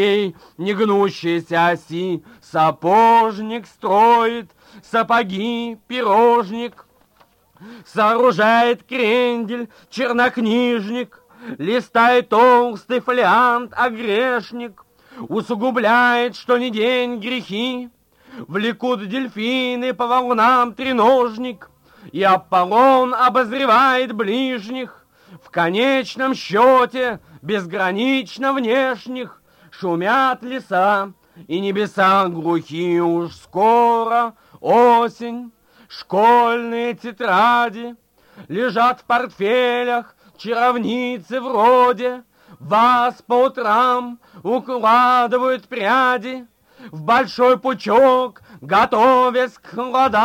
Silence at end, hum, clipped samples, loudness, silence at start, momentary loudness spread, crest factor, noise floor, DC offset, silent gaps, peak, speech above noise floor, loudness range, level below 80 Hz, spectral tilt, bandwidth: 0 s; none; under 0.1%; -17 LUFS; 0 s; 14 LU; 14 dB; -56 dBFS; under 0.1%; none; -2 dBFS; 39 dB; 4 LU; -62 dBFS; -5.5 dB/octave; 16.5 kHz